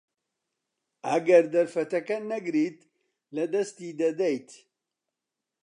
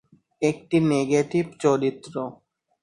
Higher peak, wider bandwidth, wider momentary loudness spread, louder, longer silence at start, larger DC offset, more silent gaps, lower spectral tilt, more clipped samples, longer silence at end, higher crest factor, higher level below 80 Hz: about the same, -8 dBFS vs -8 dBFS; about the same, 10.5 kHz vs 11 kHz; about the same, 13 LU vs 12 LU; second, -27 LUFS vs -24 LUFS; first, 1.05 s vs 0.4 s; neither; neither; about the same, -5.5 dB/octave vs -6.5 dB/octave; neither; first, 1.1 s vs 0.5 s; about the same, 20 dB vs 16 dB; second, -86 dBFS vs -62 dBFS